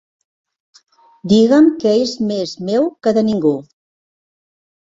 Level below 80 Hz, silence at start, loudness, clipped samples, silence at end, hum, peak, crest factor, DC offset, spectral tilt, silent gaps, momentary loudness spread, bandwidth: -58 dBFS; 1.25 s; -15 LUFS; under 0.1%; 1.25 s; none; -2 dBFS; 16 dB; under 0.1%; -6.5 dB/octave; none; 10 LU; 7.8 kHz